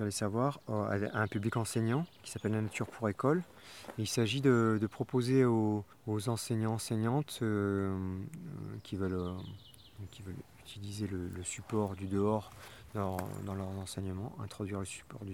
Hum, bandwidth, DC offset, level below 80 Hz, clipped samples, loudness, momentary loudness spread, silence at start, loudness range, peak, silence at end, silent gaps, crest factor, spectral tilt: none; 16.5 kHz; under 0.1%; -64 dBFS; under 0.1%; -35 LUFS; 17 LU; 0 s; 8 LU; -16 dBFS; 0 s; none; 20 dB; -6 dB/octave